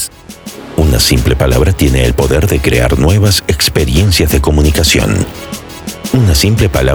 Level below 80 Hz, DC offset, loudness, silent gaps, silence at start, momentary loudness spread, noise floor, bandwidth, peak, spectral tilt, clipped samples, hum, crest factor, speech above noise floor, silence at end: -16 dBFS; under 0.1%; -10 LUFS; none; 0 s; 14 LU; -30 dBFS; over 20 kHz; 0 dBFS; -5 dB/octave; under 0.1%; none; 10 dB; 21 dB; 0 s